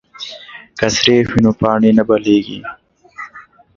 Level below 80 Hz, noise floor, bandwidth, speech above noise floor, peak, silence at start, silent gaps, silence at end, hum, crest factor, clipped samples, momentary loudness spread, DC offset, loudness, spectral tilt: -44 dBFS; -41 dBFS; 7.4 kHz; 28 dB; 0 dBFS; 0.2 s; none; 0.35 s; none; 16 dB; under 0.1%; 20 LU; under 0.1%; -13 LUFS; -5 dB/octave